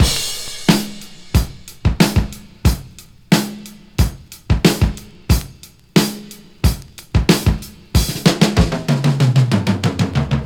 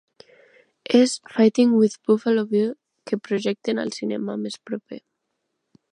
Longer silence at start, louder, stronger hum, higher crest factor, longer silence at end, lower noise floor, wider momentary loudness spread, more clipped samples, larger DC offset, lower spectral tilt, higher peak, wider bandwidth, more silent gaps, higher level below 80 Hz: second, 0 s vs 0.9 s; first, -17 LUFS vs -22 LUFS; neither; about the same, 16 dB vs 20 dB; second, 0 s vs 0.95 s; second, -41 dBFS vs -77 dBFS; about the same, 14 LU vs 15 LU; neither; neither; about the same, -5 dB/octave vs -5.5 dB/octave; first, 0 dBFS vs -4 dBFS; first, over 20 kHz vs 10.5 kHz; neither; first, -24 dBFS vs -76 dBFS